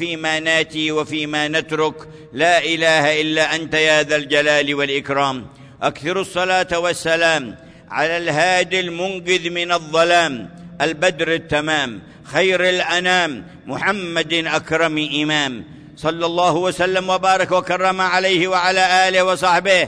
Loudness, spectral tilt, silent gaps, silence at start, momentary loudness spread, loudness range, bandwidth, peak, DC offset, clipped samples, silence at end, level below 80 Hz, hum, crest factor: -17 LUFS; -3.5 dB/octave; none; 0 s; 9 LU; 3 LU; 11 kHz; -4 dBFS; under 0.1%; under 0.1%; 0 s; -54 dBFS; none; 14 dB